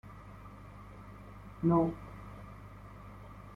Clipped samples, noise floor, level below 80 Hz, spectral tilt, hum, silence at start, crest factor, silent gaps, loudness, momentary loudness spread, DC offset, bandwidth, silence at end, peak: under 0.1%; -50 dBFS; -54 dBFS; -10 dB/octave; 50 Hz at -50 dBFS; 0.05 s; 22 dB; none; -32 LUFS; 22 LU; under 0.1%; 5.8 kHz; 0 s; -16 dBFS